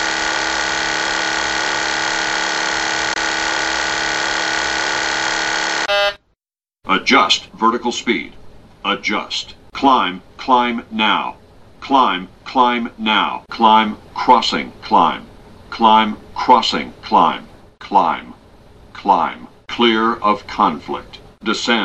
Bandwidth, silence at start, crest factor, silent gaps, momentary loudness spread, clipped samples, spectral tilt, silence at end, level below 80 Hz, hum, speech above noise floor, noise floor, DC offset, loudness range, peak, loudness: 9.2 kHz; 0 s; 18 dB; none; 11 LU; under 0.1%; -2.5 dB/octave; 0 s; -48 dBFS; none; 71 dB; -87 dBFS; under 0.1%; 3 LU; 0 dBFS; -16 LUFS